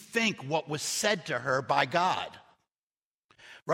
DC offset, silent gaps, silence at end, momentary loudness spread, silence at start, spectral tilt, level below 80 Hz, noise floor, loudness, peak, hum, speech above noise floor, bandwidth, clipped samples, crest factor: under 0.1%; 2.83-3.29 s, 3.62-3.66 s; 0 s; 7 LU; 0 s; -3 dB/octave; -74 dBFS; under -90 dBFS; -29 LUFS; -8 dBFS; none; over 61 dB; 16 kHz; under 0.1%; 22 dB